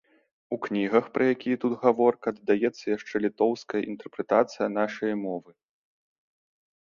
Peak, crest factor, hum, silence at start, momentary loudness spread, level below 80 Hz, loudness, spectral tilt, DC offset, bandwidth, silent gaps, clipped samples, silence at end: -6 dBFS; 22 dB; none; 0.5 s; 10 LU; -70 dBFS; -27 LUFS; -6.5 dB/octave; under 0.1%; 7.2 kHz; none; under 0.1%; 1.45 s